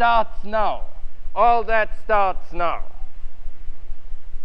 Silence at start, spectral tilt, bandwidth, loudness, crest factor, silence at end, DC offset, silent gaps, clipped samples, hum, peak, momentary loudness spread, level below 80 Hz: 0 s; -6.5 dB/octave; 5.2 kHz; -22 LUFS; 16 dB; 0 s; 5%; none; under 0.1%; none; -4 dBFS; 24 LU; -30 dBFS